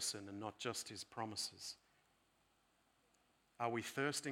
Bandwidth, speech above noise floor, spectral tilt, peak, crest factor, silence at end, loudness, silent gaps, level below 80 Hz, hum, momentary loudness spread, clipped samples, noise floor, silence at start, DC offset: 18 kHz; 33 dB; -2.5 dB/octave; -24 dBFS; 22 dB; 0 s; -45 LUFS; none; -86 dBFS; none; 10 LU; under 0.1%; -78 dBFS; 0 s; under 0.1%